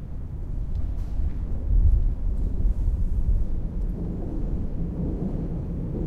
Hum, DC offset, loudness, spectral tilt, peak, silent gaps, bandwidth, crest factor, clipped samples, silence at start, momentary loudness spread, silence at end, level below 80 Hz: none; under 0.1%; -29 LUFS; -10.5 dB/octave; -10 dBFS; none; 2.2 kHz; 14 dB; under 0.1%; 0 s; 8 LU; 0 s; -24 dBFS